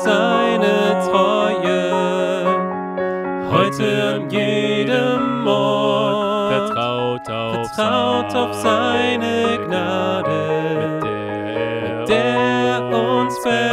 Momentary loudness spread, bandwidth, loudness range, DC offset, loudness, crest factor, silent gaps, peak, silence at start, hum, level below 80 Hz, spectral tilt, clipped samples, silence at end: 6 LU; 15 kHz; 2 LU; under 0.1%; -18 LUFS; 16 dB; none; -2 dBFS; 0 s; none; -56 dBFS; -5.5 dB/octave; under 0.1%; 0 s